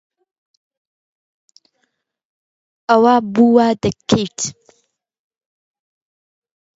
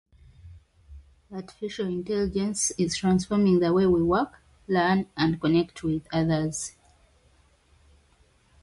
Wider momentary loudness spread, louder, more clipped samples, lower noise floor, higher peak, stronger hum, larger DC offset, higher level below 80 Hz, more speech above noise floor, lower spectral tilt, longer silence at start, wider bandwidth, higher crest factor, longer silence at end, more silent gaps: about the same, 12 LU vs 13 LU; first, -15 LUFS vs -25 LUFS; neither; first, -70 dBFS vs -62 dBFS; first, 0 dBFS vs -10 dBFS; neither; neither; about the same, -52 dBFS vs -50 dBFS; first, 56 dB vs 37 dB; about the same, -5 dB/octave vs -5.5 dB/octave; first, 2.9 s vs 0.45 s; second, 8 kHz vs 11.5 kHz; about the same, 20 dB vs 18 dB; first, 2.25 s vs 1.95 s; neither